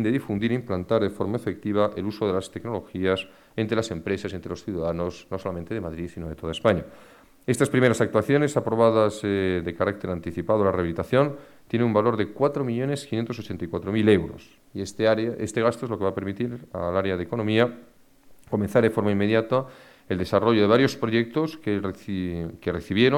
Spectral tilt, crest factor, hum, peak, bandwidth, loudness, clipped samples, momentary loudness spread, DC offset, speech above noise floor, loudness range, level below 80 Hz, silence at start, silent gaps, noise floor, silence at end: -6.5 dB/octave; 20 dB; none; -6 dBFS; 16.5 kHz; -25 LUFS; under 0.1%; 11 LU; under 0.1%; 29 dB; 6 LU; -52 dBFS; 0 s; none; -53 dBFS; 0 s